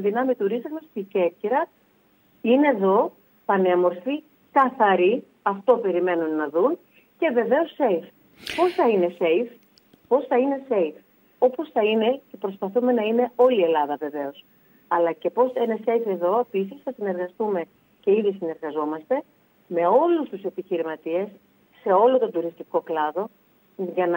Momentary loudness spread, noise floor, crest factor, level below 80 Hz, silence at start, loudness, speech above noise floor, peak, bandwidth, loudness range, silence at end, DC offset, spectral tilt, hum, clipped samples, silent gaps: 11 LU; -61 dBFS; 18 dB; -74 dBFS; 0 s; -23 LUFS; 39 dB; -6 dBFS; 16 kHz; 3 LU; 0 s; under 0.1%; -7 dB/octave; none; under 0.1%; none